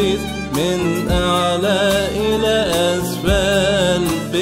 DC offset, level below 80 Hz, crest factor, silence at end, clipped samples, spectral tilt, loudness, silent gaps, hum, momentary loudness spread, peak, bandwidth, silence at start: 0.2%; -30 dBFS; 14 dB; 0 s; under 0.1%; -4.5 dB/octave; -17 LUFS; none; none; 4 LU; -2 dBFS; 16 kHz; 0 s